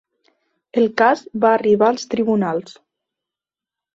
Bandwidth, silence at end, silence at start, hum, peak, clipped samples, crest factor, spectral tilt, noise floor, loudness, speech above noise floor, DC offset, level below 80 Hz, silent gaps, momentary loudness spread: 7.8 kHz; 1.25 s; 0.75 s; none; -2 dBFS; under 0.1%; 18 dB; -6 dB/octave; -88 dBFS; -18 LUFS; 71 dB; under 0.1%; -64 dBFS; none; 8 LU